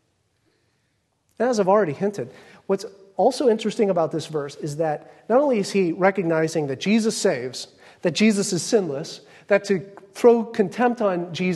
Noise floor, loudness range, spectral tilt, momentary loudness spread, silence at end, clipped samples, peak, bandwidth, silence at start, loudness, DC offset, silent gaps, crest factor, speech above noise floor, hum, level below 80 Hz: -69 dBFS; 3 LU; -5 dB/octave; 13 LU; 0 s; under 0.1%; -4 dBFS; 12.5 kHz; 1.4 s; -22 LUFS; under 0.1%; none; 18 dB; 48 dB; none; -70 dBFS